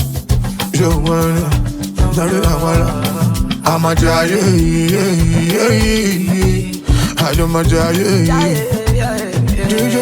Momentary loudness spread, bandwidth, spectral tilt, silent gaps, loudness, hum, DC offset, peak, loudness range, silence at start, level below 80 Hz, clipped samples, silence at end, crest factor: 5 LU; over 20 kHz; -5.5 dB/octave; none; -14 LUFS; none; under 0.1%; 0 dBFS; 2 LU; 0 s; -22 dBFS; under 0.1%; 0 s; 14 dB